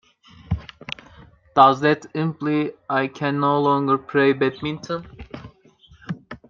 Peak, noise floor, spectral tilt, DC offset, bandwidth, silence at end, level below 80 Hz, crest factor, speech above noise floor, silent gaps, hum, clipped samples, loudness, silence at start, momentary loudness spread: -2 dBFS; -52 dBFS; -7 dB/octave; under 0.1%; 7.2 kHz; 0.15 s; -48 dBFS; 22 dB; 33 dB; none; none; under 0.1%; -21 LUFS; 0.5 s; 19 LU